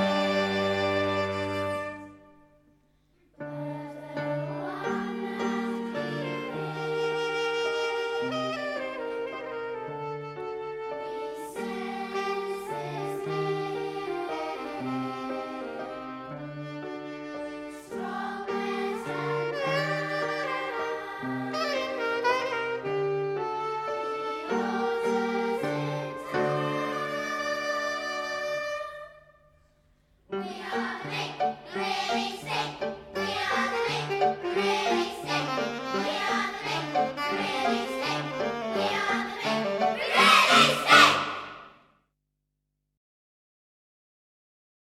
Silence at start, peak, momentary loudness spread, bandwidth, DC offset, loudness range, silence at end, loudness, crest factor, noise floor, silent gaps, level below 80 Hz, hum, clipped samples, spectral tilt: 0 s; -4 dBFS; 10 LU; 16 kHz; under 0.1%; 13 LU; 3.2 s; -28 LUFS; 26 dB; -80 dBFS; none; -66 dBFS; none; under 0.1%; -4 dB/octave